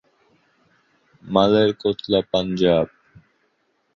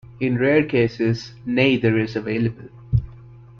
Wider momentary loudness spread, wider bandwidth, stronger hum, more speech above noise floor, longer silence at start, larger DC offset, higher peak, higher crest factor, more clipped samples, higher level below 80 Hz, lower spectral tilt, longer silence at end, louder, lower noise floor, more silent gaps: about the same, 7 LU vs 9 LU; about the same, 7 kHz vs 6.8 kHz; neither; first, 49 dB vs 23 dB; first, 1.25 s vs 0.1 s; neither; about the same, -2 dBFS vs -4 dBFS; about the same, 20 dB vs 18 dB; neither; second, -52 dBFS vs -42 dBFS; about the same, -7 dB/octave vs -7.5 dB/octave; first, 1.1 s vs 0.2 s; about the same, -20 LUFS vs -21 LUFS; first, -68 dBFS vs -43 dBFS; neither